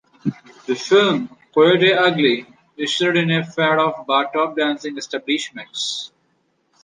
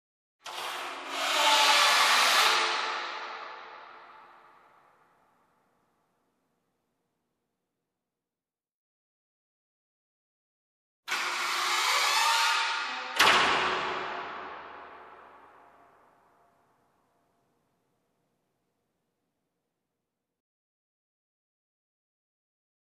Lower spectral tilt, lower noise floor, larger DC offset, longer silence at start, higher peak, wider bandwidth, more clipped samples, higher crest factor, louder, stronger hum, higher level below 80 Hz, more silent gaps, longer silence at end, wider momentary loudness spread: first, -4.5 dB/octave vs 1 dB/octave; second, -65 dBFS vs under -90 dBFS; neither; second, 0.25 s vs 0.45 s; first, -2 dBFS vs -8 dBFS; second, 9.8 kHz vs 14 kHz; neither; second, 16 dB vs 24 dB; first, -19 LUFS vs -25 LUFS; neither; first, -68 dBFS vs -74 dBFS; second, none vs 8.72-11.03 s; second, 0.75 s vs 7.7 s; second, 13 LU vs 22 LU